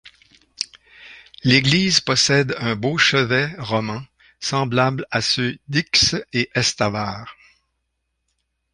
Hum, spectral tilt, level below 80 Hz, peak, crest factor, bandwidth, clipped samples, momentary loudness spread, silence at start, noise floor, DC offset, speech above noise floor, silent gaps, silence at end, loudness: none; -3.5 dB/octave; -50 dBFS; -2 dBFS; 20 dB; 11 kHz; under 0.1%; 14 LU; 0.05 s; -74 dBFS; under 0.1%; 55 dB; none; 1.4 s; -19 LUFS